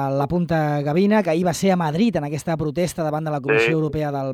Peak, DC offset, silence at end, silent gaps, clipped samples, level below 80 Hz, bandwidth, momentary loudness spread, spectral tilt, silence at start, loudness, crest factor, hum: -6 dBFS; under 0.1%; 0 s; none; under 0.1%; -50 dBFS; 15.5 kHz; 6 LU; -6.5 dB/octave; 0 s; -21 LUFS; 14 dB; none